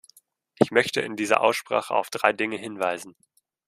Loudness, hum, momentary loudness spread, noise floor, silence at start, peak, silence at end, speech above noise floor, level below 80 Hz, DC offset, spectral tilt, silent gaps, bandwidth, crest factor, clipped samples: -24 LUFS; none; 7 LU; -60 dBFS; 0.6 s; -2 dBFS; 0.6 s; 35 dB; -72 dBFS; under 0.1%; -4 dB/octave; none; 15 kHz; 24 dB; under 0.1%